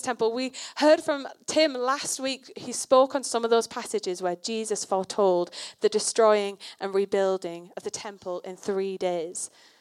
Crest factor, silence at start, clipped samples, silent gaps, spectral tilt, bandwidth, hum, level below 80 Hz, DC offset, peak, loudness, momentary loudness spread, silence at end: 20 dB; 0 s; under 0.1%; none; -3 dB/octave; 14.5 kHz; none; -78 dBFS; under 0.1%; -6 dBFS; -26 LUFS; 14 LU; 0.35 s